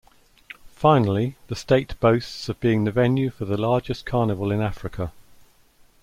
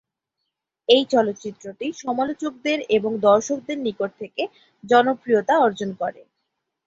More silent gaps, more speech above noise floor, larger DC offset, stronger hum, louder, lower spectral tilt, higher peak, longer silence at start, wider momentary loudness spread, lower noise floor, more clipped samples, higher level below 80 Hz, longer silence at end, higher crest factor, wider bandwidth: neither; second, 34 dB vs 59 dB; neither; neither; about the same, -23 LUFS vs -21 LUFS; first, -7.5 dB/octave vs -4 dB/octave; about the same, -4 dBFS vs -2 dBFS; second, 0.65 s vs 0.9 s; about the same, 14 LU vs 13 LU; second, -56 dBFS vs -80 dBFS; neither; first, -46 dBFS vs -66 dBFS; about the same, 0.8 s vs 0.75 s; about the same, 20 dB vs 20 dB; first, 14.5 kHz vs 7.8 kHz